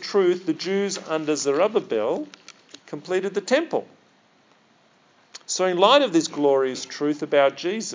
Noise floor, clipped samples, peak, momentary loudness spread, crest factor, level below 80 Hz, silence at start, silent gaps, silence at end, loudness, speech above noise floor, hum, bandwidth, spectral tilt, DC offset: -59 dBFS; under 0.1%; -2 dBFS; 11 LU; 20 dB; -86 dBFS; 0 s; none; 0 s; -22 LUFS; 37 dB; none; 7.6 kHz; -3.5 dB/octave; under 0.1%